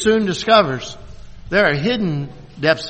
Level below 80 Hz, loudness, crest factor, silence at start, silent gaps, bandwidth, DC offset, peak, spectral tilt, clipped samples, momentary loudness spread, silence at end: -42 dBFS; -17 LUFS; 18 dB; 0 s; none; 8.8 kHz; under 0.1%; 0 dBFS; -5 dB/octave; under 0.1%; 17 LU; 0 s